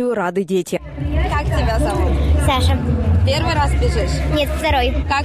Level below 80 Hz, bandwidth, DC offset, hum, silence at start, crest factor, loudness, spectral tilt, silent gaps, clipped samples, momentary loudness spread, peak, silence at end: -20 dBFS; 14 kHz; under 0.1%; none; 0 s; 12 dB; -18 LUFS; -6 dB/octave; none; under 0.1%; 4 LU; -6 dBFS; 0 s